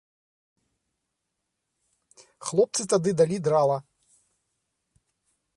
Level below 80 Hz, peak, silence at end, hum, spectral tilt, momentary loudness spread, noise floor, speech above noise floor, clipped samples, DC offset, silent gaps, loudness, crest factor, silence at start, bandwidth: -70 dBFS; -10 dBFS; 1.75 s; none; -5 dB/octave; 8 LU; -81 dBFS; 58 dB; under 0.1%; under 0.1%; none; -24 LUFS; 20 dB; 2.4 s; 11.5 kHz